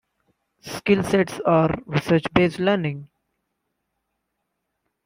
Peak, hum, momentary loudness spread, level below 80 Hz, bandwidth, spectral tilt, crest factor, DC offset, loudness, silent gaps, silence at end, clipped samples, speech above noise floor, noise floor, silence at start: -2 dBFS; none; 10 LU; -52 dBFS; 16 kHz; -6.5 dB/octave; 20 dB; under 0.1%; -21 LUFS; none; 2 s; under 0.1%; 57 dB; -78 dBFS; 0.65 s